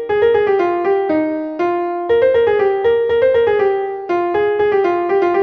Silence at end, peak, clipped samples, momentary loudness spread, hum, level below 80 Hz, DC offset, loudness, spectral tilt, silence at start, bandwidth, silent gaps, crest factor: 0 s; -4 dBFS; under 0.1%; 6 LU; none; -50 dBFS; under 0.1%; -15 LUFS; -7 dB/octave; 0 s; 6.2 kHz; none; 12 dB